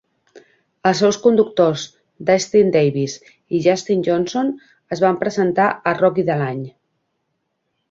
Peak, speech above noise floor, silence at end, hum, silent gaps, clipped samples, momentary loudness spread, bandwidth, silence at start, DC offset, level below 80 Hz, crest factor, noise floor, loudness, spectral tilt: -2 dBFS; 55 dB; 1.2 s; none; none; under 0.1%; 12 LU; 7.8 kHz; 0.35 s; under 0.1%; -60 dBFS; 16 dB; -72 dBFS; -18 LUFS; -5.5 dB/octave